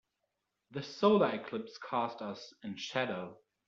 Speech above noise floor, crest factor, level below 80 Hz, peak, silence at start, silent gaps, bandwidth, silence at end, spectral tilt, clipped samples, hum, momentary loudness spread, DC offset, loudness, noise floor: 51 dB; 20 dB; -78 dBFS; -16 dBFS; 0.7 s; none; 7.4 kHz; 0.35 s; -4 dB/octave; under 0.1%; none; 17 LU; under 0.1%; -34 LUFS; -85 dBFS